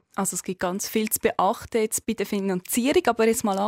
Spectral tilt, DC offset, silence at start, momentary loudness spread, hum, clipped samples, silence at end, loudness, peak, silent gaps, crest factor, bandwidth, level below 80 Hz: -4 dB/octave; under 0.1%; 0.15 s; 6 LU; none; under 0.1%; 0 s; -24 LUFS; -8 dBFS; none; 16 dB; 16 kHz; -56 dBFS